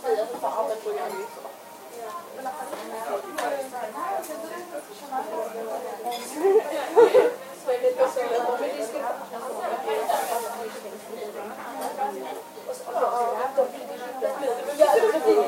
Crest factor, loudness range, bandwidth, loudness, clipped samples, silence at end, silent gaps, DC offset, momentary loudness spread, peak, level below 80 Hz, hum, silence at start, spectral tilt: 22 dB; 9 LU; 16 kHz; -26 LUFS; under 0.1%; 0 s; none; under 0.1%; 16 LU; -4 dBFS; -84 dBFS; none; 0 s; -3 dB/octave